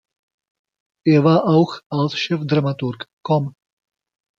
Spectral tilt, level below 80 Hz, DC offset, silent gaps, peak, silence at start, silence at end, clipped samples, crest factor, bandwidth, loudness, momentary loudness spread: -7.5 dB/octave; -62 dBFS; under 0.1%; 1.86-1.90 s, 3.13-3.17 s; -2 dBFS; 1.05 s; 0.9 s; under 0.1%; 18 dB; 7.2 kHz; -19 LUFS; 12 LU